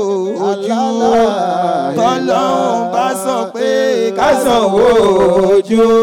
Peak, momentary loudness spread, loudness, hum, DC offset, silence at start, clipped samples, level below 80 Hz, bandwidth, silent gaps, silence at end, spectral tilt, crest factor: -4 dBFS; 6 LU; -13 LUFS; none; under 0.1%; 0 s; under 0.1%; -44 dBFS; 17 kHz; none; 0 s; -5 dB/octave; 8 dB